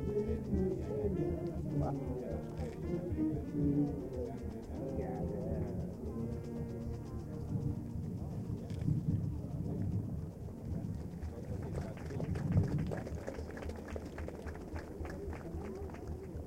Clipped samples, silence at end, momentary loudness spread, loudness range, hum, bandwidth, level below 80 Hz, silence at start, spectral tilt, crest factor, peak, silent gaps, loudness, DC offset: under 0.1%; 0 s; 9 LU; 4 LU; none; 16 kHz; -48 dBFS; 0 s; -9 dB/octave; 20 dB; -18 dBFS; none; -39 LUFS; under 0.1%